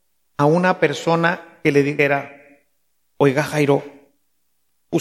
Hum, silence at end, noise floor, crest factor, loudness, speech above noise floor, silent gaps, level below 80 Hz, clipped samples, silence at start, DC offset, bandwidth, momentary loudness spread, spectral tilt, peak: none; 0 s; -71 dBFS; 18 dB; -18 LUFS; 54 dB; none; -62 dBFS; under 0.1%; 0.4 s; under 0.1%; 14.5 kHz; 7 LU; -6.5 dB/octave; -2 dBFS